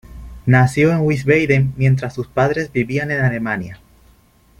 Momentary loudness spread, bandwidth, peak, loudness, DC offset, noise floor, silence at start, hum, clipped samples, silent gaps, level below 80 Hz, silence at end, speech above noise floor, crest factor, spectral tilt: 9 LU; 11 kHz; -2 dBFS; -17 LUFS; under 0.1%; -52 dBFS; 0.1 s; none; under 0.1%; none; -42 dBFS; 0.85 s; 36 dB; 16 dB; -7.5 dB/octave